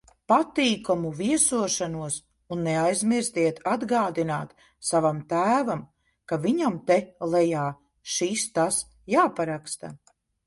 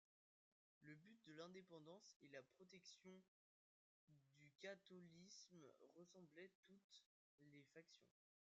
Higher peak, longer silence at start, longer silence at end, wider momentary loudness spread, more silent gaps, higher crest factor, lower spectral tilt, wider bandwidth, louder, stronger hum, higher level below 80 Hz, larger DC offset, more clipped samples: first, -8 dBFS vs -44 dBFS; second, 0.3 s vs 0.8 s; about the same, 0.5 s vs 0.45 s; about the same, 10 LU vs 8 LU; second, none vs 2.16-2.20 s, 3.28-4.07 s, 6.55-6.63 s, 6.84-6.89 s, 7.06-7.38 s; about the same, 18 dB vs 22 dB; about the same, -4 dB/octave vs -3.5 dB/octave; first, 11.5 kHz vs 7.4 kHz; first, -25 LUFS vs -65 LUFS; neither; first, -62 dBFS vs under -90 dBFS; neither; neither